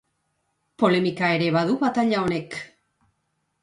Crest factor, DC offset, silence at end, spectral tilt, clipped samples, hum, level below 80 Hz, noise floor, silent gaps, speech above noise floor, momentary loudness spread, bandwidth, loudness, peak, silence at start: 18 dB; under 0.1%; 0.95 s; -6.5 dB/octave; under 0.1%; none; -62 dBFS; -74 dBFS; none; 52 dB; 14 LU; 11.5 kHz; -22 LUFS; -8 dBFS; 0.8 s